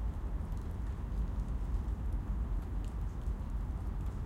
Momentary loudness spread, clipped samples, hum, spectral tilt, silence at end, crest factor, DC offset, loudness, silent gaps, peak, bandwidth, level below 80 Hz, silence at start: 2 LU; under 0.1%; none; -8.5 dB/octave; 0 s; 12 dB; under 0.1%; -40 LUFS; none; -24 dBFS; 8.2 kHz; -38 dBFS; 0 s